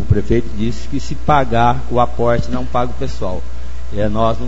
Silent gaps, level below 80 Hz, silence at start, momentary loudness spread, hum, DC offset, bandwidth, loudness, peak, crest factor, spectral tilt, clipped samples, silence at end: none; -26 dBFS; 0 s; 10 LU; none; 20%; 8 kHz; -18 LUFS; 0 dBFS; 18 dB; -7 dB/octave; under 0.1%; 0 s